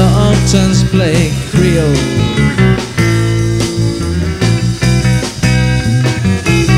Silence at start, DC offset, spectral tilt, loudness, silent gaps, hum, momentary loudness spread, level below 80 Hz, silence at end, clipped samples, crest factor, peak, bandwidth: 0 s; 0.2%; -5.5 dB/octave; -12 LUFS; none; none; 4 LU; -24 dBFS; 0 s; under 0.1%; 10 dB; 0 dBFS; 14.5 kHz